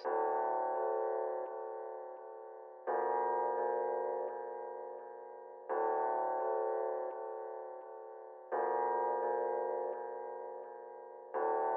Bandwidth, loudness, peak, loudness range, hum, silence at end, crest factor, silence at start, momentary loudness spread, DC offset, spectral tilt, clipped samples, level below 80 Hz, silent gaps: 3.7 kHz; -37 LUFS; -22 dBFS; 1 LU; none; 0 s; 14 dB; 0 s; 15 LU; under 0.1%; 5.5 dB/octave; under 0.1%; under -90 dBFS; none